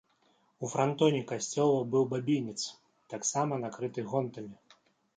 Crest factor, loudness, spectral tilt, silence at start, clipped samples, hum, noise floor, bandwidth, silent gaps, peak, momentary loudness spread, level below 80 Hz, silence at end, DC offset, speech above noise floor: 18 dB; -31 LUFS; -5 dB/octave; 0.6 s; under 0.1%; none; -70 dBFS; 9.6 kHz; none; -14 dBFS; 13 LU; -76 dBFS; 0.65 s; under 0.1%; 39 dB